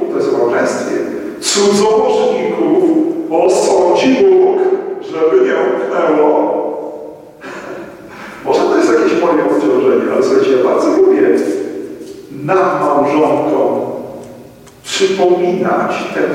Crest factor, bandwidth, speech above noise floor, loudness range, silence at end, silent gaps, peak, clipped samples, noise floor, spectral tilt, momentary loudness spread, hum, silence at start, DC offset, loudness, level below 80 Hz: 12 dB; 13 kHz; 26 dB; 4 LU; 0 s; none; 0 dBFS; under 0.1%; -37 dBFS; -4.5 dB/octave; 17 LU; none; 0 s; under 0.1%; -12 LUFS; -56 dBFS